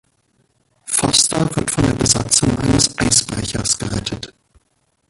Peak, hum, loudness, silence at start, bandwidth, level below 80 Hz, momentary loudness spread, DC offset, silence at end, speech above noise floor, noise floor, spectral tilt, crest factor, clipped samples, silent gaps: 0 dBFS; none; -16 LUFS; 0.85 s; 13.5 kHz; -36 dBFS; 11 LU; under 0.1%; 0.85 s; 47 dB; -65 dBFS; -3 dB/octave; 18 dB; under 0.1%; none